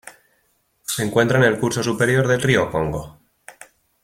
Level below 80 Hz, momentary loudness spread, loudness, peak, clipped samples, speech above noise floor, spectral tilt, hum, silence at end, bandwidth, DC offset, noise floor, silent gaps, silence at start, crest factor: -48 dBFS; 10 LU; -19 LUFS; -2 dBFS; under 0.1%; 47 dB; -5 dB/octave; none; 0.55 s; 16.5 kHz; under 0.1%; -65 dBFS; none; 0.05 s; 20 dB